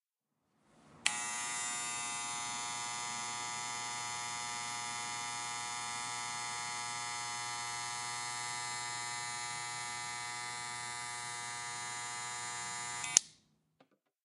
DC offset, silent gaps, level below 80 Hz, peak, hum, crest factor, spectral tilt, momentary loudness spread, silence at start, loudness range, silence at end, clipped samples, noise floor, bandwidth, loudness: under 0.1%; none; -78 dBFS; 0 dBFS; none; 40 dB; 0.5 dB/octave; 4 LU; 0.75 s; 3 LU; 0.9 s; under 0.1%; -85 dBFS; 16 kHz; -37 LUFS